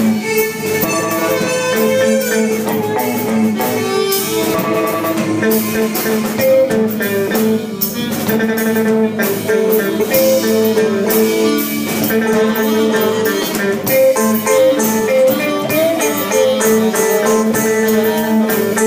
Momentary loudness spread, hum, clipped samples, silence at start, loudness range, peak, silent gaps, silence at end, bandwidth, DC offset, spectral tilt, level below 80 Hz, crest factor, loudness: 4 LU; none; under 0.1%; 0 s; 2 LU; 0 dBFS; none; 0 s; 16 kHz; under 0.1%; -4 dB/octave; -56 dBFS; 14 dB; -14 LUFS